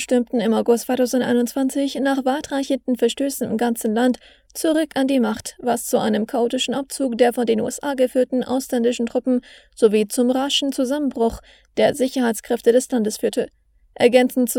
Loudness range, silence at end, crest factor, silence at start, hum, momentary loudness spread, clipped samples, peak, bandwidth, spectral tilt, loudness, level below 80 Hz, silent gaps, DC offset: 1 LU; 0 s; 18 dB; 0 s; none; 6 LU; under 0.1%; -2 dBFS; 17.5 kHz; -4 dB/octave; -20 LUFS; -54 dBFS; none; under 0.1%